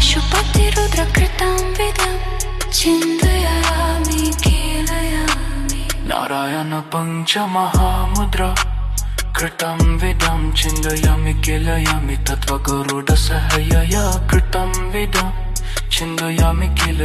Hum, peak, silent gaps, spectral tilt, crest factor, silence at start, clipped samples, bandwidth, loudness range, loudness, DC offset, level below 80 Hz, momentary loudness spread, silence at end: none; 0 dBFS; none; -4 dB/octave; 16 dB; 0 s; under 0.1%; 14 kHz; 2 LU; -18 LUFS; under 0.1%; -20 dBFS; 6 LU; 0 s